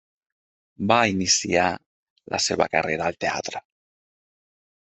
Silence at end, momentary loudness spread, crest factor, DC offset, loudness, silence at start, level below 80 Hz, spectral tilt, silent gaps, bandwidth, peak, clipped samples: 1.35 s; 12 LU; 24 dB; under 0.1%; -22 LUFS; 0.8 s; -62 dBFS; -3 dB/octave; 1.86-2.16 s; 8.4 kHz; -2 dBFS; under 0.1%